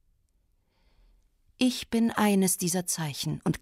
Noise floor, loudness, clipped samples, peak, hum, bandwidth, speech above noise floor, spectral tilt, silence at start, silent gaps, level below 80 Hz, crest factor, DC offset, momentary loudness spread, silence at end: -70 dBFS; -27 LUFS; under 0.1%; -10 dBFS; none; 16 kHz; 43 dB; -4 dB/octave; 1.6 s; none; -60 dBFS; 20 dB; under 0.1%; 6 LU; 0.05 s